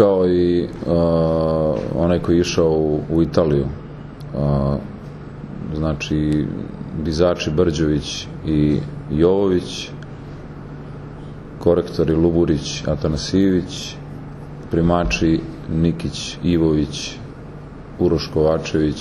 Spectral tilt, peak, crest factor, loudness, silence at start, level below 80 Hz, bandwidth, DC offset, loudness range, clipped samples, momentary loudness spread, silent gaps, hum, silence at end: -6.5 dB/octave; -2 dBFS; 18 dB; -19 LUFS; 0 s; -34 dBFS; 11.5 kHz; under 0.1%; 4 LU; under 0.1%; 18 LU; none; none; 0 s